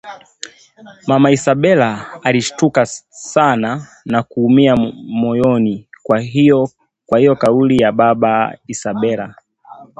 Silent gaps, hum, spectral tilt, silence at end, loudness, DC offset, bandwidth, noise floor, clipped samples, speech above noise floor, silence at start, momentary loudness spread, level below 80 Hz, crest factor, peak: none; none; -6 dB/octave; 0.15 s; -14 LUFS; under 0.1%; 9 kHz; -40 dBFS; under 0.1%; 26 dB; 0.05 s; 14 LU; -50 dBFS; 14 dB; 0 dBFS